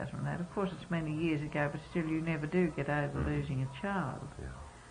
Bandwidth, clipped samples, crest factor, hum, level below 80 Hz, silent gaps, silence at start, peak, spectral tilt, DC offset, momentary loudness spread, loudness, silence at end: 10.5 kHz; under 0.1%; 18 dB; none; -52 dBFS; none; 0 s; -18 dBFS; -7.5 dB/octave; under 0.1%; 10 LU; -35 LUFS; 0 s